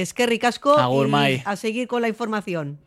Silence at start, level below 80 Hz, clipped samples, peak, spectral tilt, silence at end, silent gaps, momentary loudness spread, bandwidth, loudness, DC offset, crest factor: 0 s; -64 dBFS; under 0.1%; -4 dBFS; -5 dB/octave; 0.1 s; none; 8 LU; 15.5 kHz; -21 LUFS; under 0.1%; 16 dB